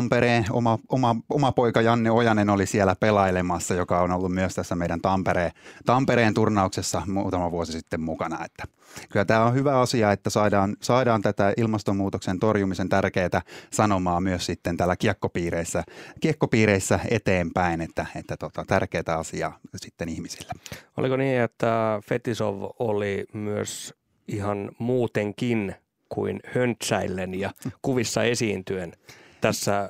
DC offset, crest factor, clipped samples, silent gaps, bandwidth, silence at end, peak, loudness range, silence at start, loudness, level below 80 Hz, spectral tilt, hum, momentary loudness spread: under 0.1%; 20 dB; under 0.1%; none; 16 kHz; 0 s; -4 dBFS; 6 LU; 0 s; -24 LUFS; -56 dBFS; -5.5 dB/octave; none; 12 LU